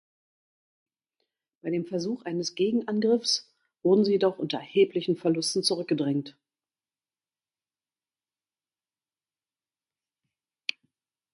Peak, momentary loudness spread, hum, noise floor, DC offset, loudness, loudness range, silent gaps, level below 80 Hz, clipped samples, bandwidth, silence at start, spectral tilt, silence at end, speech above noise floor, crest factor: -8 dBFS; 11 LU; none; under -90 dBFS; under 0.1%; -27 LUFS; 16 LU; none; -76 dBFS; under 0.1%; 11.5 kHz; 1.65 s; -4.5 dB/octave; 5.05 s; over 64 dB; 22 dB